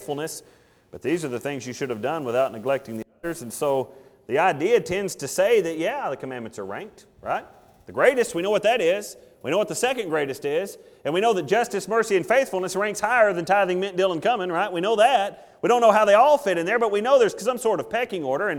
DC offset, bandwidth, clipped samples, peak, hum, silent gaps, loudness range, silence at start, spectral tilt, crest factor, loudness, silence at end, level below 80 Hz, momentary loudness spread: under 0.1%; 19 kHz; under 0.1%; -4 dBFS; none; none; 7 LU; 0 s; -4 dB/octave; 20 dB; -22 LUFS; 0 s; -62 dBFS; 14 LU